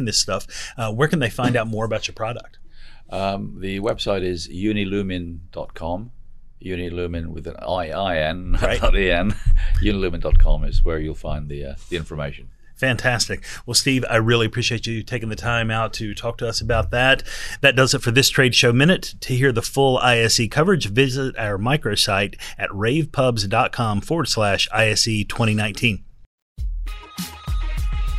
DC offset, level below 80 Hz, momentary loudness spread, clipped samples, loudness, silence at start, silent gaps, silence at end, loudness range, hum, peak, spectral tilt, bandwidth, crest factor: under 0.1%; -26 dBFS; 14 LU; under 0.1%; -20 LUFS; 0 s; 26.26-26.56 s; 0 s; 9 LU; none; 0 dBFS; -4 dB/octave; 14 kHz; 20 dB